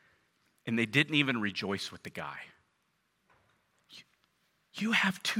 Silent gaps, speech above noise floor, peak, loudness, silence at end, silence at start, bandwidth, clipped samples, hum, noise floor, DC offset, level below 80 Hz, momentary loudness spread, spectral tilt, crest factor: none; 45 dB; -10 dBFS; -31 LUFS; 0 s; 0.65 s; 16 kHz; under 0.1%; none; -76 dBFS; under 0.1%; -78 dBFS; 19 LU; -4 dB/octave; 26 dB